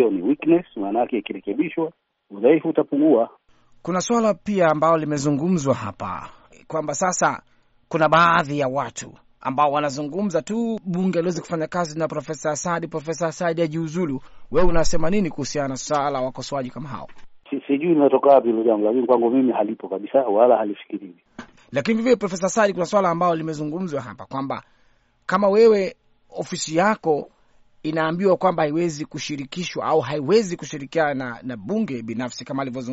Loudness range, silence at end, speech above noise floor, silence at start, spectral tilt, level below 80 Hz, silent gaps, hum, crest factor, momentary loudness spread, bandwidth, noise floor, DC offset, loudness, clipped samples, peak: 5 LU; 0 s; 39 dB; 0 s; -5.5 dB/octave; -40 dBFS; none; none; 18 dB; 14 LU; 8 kHz; -59 dBFS; under 0.1%; -21 LUFS; under 0.1%; -4 dBFS